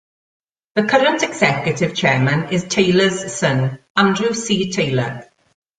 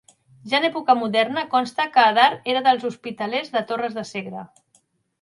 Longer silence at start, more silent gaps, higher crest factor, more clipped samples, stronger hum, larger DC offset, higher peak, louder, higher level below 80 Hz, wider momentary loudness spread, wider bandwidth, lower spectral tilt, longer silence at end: first, 0.75 s vs 0.45 s; first, 3.90-3.95 s vs none; about the same, 16 dB vs 20 dB; neither; neither; neither; about the same, -2 dBFS vs -2 dBFS; first, -17 LUFS vs -21 LUFS; first, -54 dBFS vs -72 dBFS; second, 6 LU vs 13 LU; second, 9.4 kHz vs 11.5 kHz; about the same, -4.5 dB/octave vs -4 dB/octave; second, 0.55 s vs 0.75 s